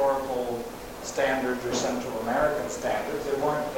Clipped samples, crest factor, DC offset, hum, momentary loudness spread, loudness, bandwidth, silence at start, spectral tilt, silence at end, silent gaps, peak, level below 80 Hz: under 0.1%; 16 dB; under 0.1%; none; 8 LU; -28 LUFS; 17 kHz; 0 s; -4 dB/octave; 0 s; none; -12 dBFS; -50 dBFS